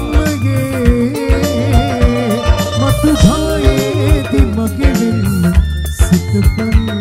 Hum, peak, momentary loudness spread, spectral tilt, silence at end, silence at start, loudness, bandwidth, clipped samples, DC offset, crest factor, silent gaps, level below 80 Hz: none; 0 dBFS; 3 LU; -6.5 dB/octave; 0 s; 0 s; -13 LUFS; 16 kHz; 0.2%; under 0.1%; 12 dB; none; -16 dBFS